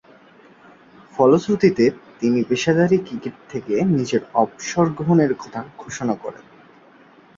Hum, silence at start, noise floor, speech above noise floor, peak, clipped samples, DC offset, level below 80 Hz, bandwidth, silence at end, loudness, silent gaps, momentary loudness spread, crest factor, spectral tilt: none; 1.15 s; -49 dBFS; 30 dB; -2 dBFS; under 0.1%; under 0.1%; -58 dBFS; 7.6 kHz; 1 s; -19 LUFS; none; 15 LU; 18 dB; -6.5 dB/octave